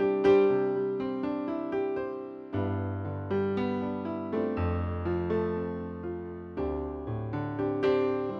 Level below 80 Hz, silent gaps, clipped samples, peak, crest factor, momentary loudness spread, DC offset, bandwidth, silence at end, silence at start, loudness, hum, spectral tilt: -50 dBFS; none; under 0.1%; -12 dBFS; 16 dB; 11 LU; under 0.1%; 6.2 kHz; 0 s; 0 s; -30 LUFS; none; -9.5 dB/octave